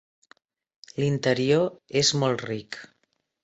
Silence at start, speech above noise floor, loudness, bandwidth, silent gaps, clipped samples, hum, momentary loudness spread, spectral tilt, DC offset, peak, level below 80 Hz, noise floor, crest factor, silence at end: 0.95 s; 49 dB; -24 LUFS; 8.2 kHz; none; under 0.1%; none; 16 LU; -4.5 dB/octave; under 0.1%; -8 dBFS; -62 dBFS; -74 dBFS; 20 dB; 0.6 s